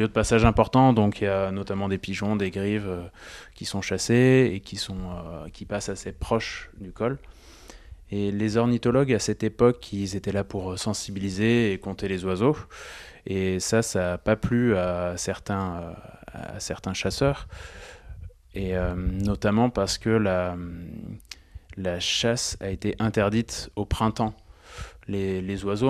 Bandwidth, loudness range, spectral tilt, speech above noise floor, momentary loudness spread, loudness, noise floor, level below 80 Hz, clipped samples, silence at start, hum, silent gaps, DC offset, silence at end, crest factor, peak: 13.5 kHz; 5 LU; -5.5 dB/octave; 22 dB; 19 LU; -25 LUFS; -47 dBFS; -42 dBFS; under 0.1%; 0 s; none; none; under 0.1%; 0 s; 22 dB; -4 dBFS